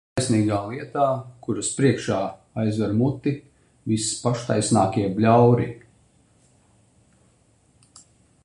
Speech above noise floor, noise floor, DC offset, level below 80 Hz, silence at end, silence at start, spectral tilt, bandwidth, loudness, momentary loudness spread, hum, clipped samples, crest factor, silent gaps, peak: 39 dB; -60 dBFS; under 0.1%; -54 dBFS; 2.65 s; 0.15 s; -6 dB/octave; 11.5 kHz; -22 LUFS; 12 LU; none; under 0.1%; 20 dB; none; -4 dBFS